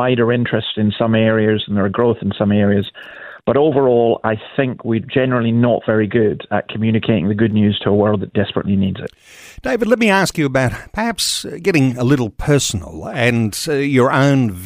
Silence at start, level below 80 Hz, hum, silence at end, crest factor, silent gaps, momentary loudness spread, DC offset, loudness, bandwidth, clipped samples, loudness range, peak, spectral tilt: 0 s; -44 dBFS; none; 0 s; 14 dB; none; 8 LU; under 0.1%; -16 LUFS; 16 kHz; under 0.1%; 2 LU; 0 dBFS; -5.5 dB/octave